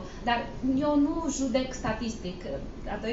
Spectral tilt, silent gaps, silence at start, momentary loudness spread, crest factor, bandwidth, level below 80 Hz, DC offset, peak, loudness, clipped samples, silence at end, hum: -5 dB/octave; none; 0 s; 12 LU; 16 dB; 8 kHz; -42 dBFS; under 0.1%; -12 dBFS; -30 LUFS; under 0.1%; 0 s; none